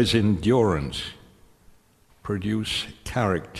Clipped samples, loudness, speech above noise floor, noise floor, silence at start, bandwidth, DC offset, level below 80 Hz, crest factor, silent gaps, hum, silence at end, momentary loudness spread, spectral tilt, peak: under 0.1%; -24 LUFS; 35 dB; -58 dBFS; 0 s; 13.5 kHz; under 0.1%; -46 dBFS; 18 dB; none; none; 0 s; 12 LU; -5.5 dB/octave; -8 dBFS